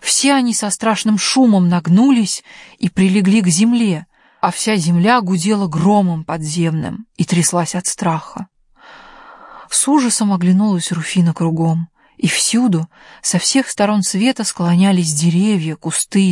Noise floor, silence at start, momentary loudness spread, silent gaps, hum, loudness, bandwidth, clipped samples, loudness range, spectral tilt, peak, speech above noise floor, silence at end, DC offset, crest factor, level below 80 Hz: -43 dBFS; 0 s; 9 LU; none; none; -15 LUFS; 11.5 kHz; under 0.1%; 4 LU; -4.5 dB/octave; -2 dBFS; 28 dB; 0 s; under 0.1%; 14 dB; -56 dBFS